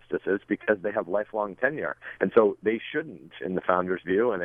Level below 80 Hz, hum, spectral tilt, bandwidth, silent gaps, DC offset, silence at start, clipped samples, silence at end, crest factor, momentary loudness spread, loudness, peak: -68 dBFS; none; -9 dB/octave; 3.7 kHz; none; under 0.1%; 0.1 s; under 0.1%; 0 s; 22 dB; 11 LU; -27 LUFS; -4 dBFS